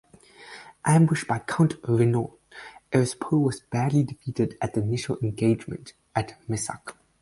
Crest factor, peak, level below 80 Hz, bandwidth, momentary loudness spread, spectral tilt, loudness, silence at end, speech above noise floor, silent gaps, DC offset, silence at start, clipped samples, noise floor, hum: 20 dB; -6 dBFS; -56 dBFS; 11.5 kHz; 19 LU; -6.5 dB/octave; -25 LUFS; 0.3 s; 24 dB; none; under 0.1%; 0.4 s; under 0.1%; -49 dBFS; none